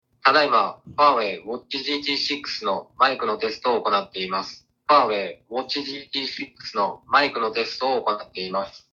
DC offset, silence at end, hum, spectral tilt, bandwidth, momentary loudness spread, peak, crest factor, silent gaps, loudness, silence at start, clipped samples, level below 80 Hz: under 0.1%; 0.15 s; none; -3.5 dB/octave; 7.6 kHz; 11 LU; -4 dBFS; 20 dB; none; -23 LUFS; 0.25 s; under 0.1%; -66 dBFS